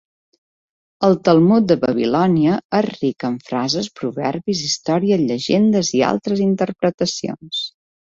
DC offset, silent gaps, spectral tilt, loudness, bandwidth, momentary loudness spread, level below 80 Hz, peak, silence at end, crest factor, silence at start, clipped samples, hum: under 0.1%; 2.65-2.70 s, 6.94-6.98 s; -5.5 dB/octave; -18 LUFS; 7.8 kHz; 11 LU; -58 dBFS; -2 dBFS; 0.5 s; 16 dB; 1 s; under 0.1%; none